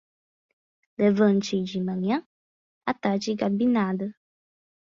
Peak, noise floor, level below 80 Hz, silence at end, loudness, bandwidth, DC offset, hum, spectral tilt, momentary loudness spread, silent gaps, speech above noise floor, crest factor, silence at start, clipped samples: -8 dBFS; under -90 dBFS; -66 dBFS; 0.75 s; -25 LUFS; 7.4 kHz; under 0.1%; none; -6.5 dB/octave; 11 LU; 2.26-2.81 s; over 66 dB; 18 dB; 1 s; under 0.1%